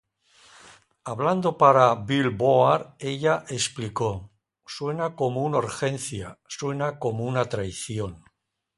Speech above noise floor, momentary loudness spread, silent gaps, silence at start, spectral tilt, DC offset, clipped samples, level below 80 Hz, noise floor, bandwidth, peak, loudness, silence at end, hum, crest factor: 47 dB; 14 LU; none; 1.05 s; -5 dB/octave; under 0.1%; under 0.1%; -56 dBFS; -71 dBFS; 11.5 kHz; -2 dBFS; -24 LUFS; 0.6 s; none; 22 dB